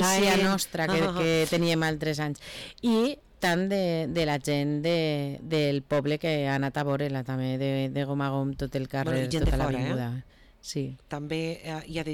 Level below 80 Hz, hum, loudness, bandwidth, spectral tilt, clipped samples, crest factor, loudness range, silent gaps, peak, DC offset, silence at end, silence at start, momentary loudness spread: -44 dBFS; none; -28 LUFS; 19 kHz; -5 dB/octave; under 0.1%; 10 dB; 3 LU; none; -18 dBFS; under 0.1%; 0 s; 0 s; 9 LU